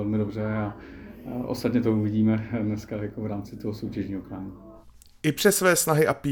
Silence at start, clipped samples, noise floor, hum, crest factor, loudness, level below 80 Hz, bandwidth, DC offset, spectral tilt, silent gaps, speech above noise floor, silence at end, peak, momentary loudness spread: 0 s; under 0.1%; -50 dBFS; none; 20 dB; -26 LUFS; -52 dBFS; 19.5 kHz; under 0.1%; -5 dB/octave; none; 25 dB; 0 s; -6 dBFS; 17 LU